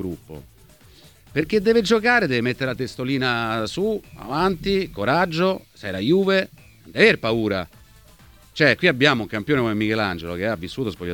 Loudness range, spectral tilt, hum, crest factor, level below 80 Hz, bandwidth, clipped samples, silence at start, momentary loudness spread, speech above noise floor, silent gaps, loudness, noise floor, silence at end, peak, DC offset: 3 LU; -5.5 dB/octave; none; 20 dB; -48 dBFS; 19 kHz; under 0.1%; 0 s; 13 LU; 29 dB; none; -21 LUFS; -50 dBFS; 0 s; -2 dBFS; under 0.1%